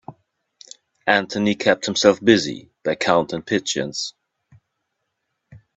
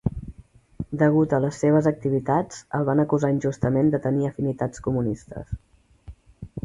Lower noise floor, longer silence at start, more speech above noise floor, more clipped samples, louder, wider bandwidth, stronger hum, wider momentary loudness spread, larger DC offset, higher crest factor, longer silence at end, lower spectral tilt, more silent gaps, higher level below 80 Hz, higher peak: first, -76 dBFS vs -49 dBFS; about the same, 0.1 s vs 0.05 s; first, 57 dB vs 27 dB; neither; first, -20 LUFS vs -23 LUFS; second, 8.4 kHz vs 11 kHz; neither; second, 11 LU vs 17 LU; neither; about the same, 22 dB vs 18 dB; first, 0.2 s vs 0.05 s; second, -4 dB/octave vs -8.5 dB/octave; neither; second, -60 dBFS vs -46 dBFS; first, 0 dBFS vs -6 dBFS